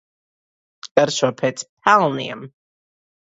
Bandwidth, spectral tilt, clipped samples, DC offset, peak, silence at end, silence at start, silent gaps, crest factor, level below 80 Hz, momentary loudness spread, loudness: 8 kHz; -4 dB/octave; under 0.1%; under 0.1%; 0 dBFS; 0.75 s; 0.85 s; 0.91-0.95 s, 1.69-1.77 s; 22 dB; -66 dBFS; 13 LU; -19 LUFS